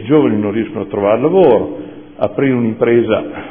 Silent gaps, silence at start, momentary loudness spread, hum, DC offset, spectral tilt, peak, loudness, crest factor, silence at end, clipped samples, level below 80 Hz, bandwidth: none; 0 s; 11 LU; none; 0.5%; -11.5 dB/octave; 0 dBFS; -14 LUFS; 14 dB; 0 s; under 0.1%; -50 dBFS; 3.6 kHz